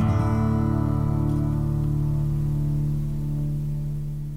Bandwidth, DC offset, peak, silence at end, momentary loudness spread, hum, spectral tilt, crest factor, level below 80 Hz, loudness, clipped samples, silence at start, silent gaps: 8.8 kHz; under 0.1%; -12 dBFS; 0 s; 6 LU; none; -9.5 dB/octave; 12 dB; -32 dBFS; -25 LUFS; under 0.1%; 0 s; none